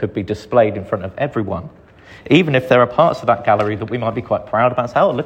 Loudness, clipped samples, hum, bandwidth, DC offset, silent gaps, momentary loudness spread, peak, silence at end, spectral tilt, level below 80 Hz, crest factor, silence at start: -17 LUFS; under 0.1%; none; 8.8 kHz; under 0.1%; none; 10 LU; 0 dBFS; 0 s; -7.5 dB/octave; -50 dBFS; 16 dB; 0 s